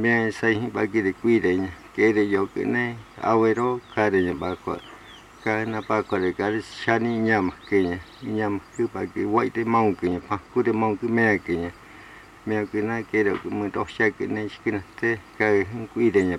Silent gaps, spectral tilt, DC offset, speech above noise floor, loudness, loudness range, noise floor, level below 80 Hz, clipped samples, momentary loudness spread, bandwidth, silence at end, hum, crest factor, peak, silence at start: none; -7 dB/octave; under 0.1%; 22 dB; -24 LUFS; 3 LU; -46 dBFS; -56 dBFS; under 0.1%; 8 LU; 11 kHz; 0 s; none; 18 dB; -6 dBFS; 0 s